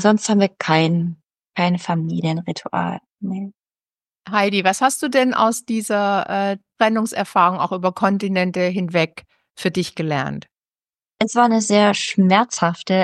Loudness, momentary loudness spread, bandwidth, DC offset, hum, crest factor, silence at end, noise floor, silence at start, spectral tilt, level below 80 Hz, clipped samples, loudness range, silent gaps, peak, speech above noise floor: -19 LUFS; 10 LU; 12.5 kHz; under 0.1%; none; 18 dB; 0 s; under -90 dBFS; 0 s; -5 dB/octave; -64 dBFS; under 0.1%; 4 LU; none; -2 dBFS; over 72 dB